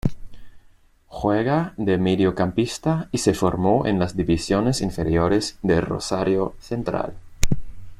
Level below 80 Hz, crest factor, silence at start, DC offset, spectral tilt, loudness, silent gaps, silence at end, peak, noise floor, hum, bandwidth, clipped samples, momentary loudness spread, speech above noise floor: -38 dBFS; 20 dB; 0.05 s; under 0.1%; -6 dB/octave; -22 LUFS; none; 0.05 s; -2 dBFS; -54 dBFS; none; 15.5 kHz; under 0.1%; 8 LU; 33 dB